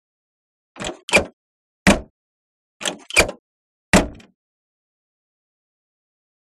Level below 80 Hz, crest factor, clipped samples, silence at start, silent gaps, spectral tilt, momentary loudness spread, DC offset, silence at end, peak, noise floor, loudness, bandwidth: -38 dBFS; 24 dB; under 0.1%; 0.75 s; 1.03-1.08 s, 1.33-1.86 s, 2.10-2.80 s, 3.39-3.93 s; -3.5 dB/octave; 14 LU; under 0.1%; 2.45 s; 0 dBFS; under -90 dBFS; -19 LUFS; 15.5 kHz